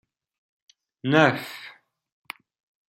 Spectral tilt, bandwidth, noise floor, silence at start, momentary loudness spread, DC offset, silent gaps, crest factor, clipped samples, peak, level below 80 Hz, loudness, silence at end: -6 dB/octave; 16.5 kHz; -49 dBFS; 1.05 s; 22 LU; under 0.1%; none; 26 dB; under 0.1%; -2 dBFS; -70 dBFS; -22 LUFS; 1.2 s